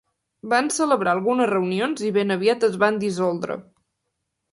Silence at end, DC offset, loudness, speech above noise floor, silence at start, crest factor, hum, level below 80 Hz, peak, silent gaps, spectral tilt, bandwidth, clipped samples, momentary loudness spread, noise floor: 0.9 s; under 0.1%; -21 LUFS; 57 dB; 0.45 s; 18 dB; none; -68 dBFS; -4 dBFS; none; -4.5 dB/octave; 11.5 kHz; under 0.1%; 7 LU; -78 dBFS